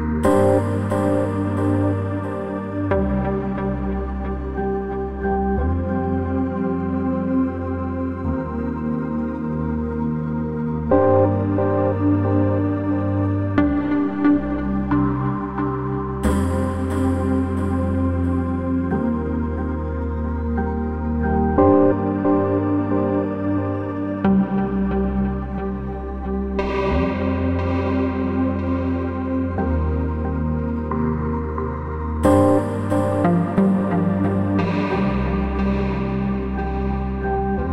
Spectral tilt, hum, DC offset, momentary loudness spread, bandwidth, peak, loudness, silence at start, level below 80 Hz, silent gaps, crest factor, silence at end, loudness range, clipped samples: -9 dB/octave; none; under 0.1%; 7 LU; 12 kHz; -4 dBFS; -21 LUFS; 0 s; -32 dBFS; none; 16 dB; 0 s; 4 LU; under 0.1%